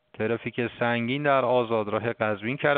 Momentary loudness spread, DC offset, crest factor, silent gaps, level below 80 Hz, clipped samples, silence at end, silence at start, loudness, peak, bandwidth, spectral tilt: 6 LU; under 0.1%; 18 dB; none; -66 dBFS; under 0.1%; 0 s; 0.2 s; -26 LUFS; -8 dBFS; 4.6 kHz; -4 dB/octave